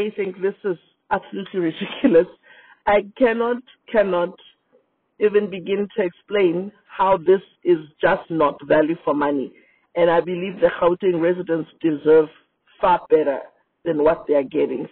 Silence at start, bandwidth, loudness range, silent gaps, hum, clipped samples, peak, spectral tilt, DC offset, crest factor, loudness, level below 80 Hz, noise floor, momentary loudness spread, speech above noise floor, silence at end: 0 s; 4.3 kHz; 3 LU; none; none; under 0.1%; -4 dBFS; -4.5 dB/octave; under 0.1%; 16 dB; -20 LUFS; -56 dBFS; -62 dBFS; 11 LU; 42 dB; 0.05 s